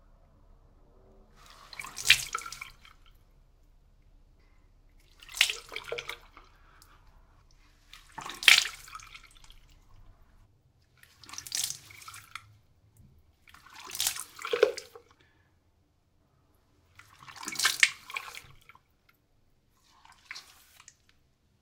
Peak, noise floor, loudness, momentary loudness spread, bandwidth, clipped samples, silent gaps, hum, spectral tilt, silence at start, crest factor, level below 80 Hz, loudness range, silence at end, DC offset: 0 dBFS; -69 dBFS; -27 LUFS; 24 LU; 18 kHz; under 0.1%; none; none; 1 dB/octave; 1.6 s; 34 dB; -62 dBFS; 12 LU; 1.2 s; under 0.1%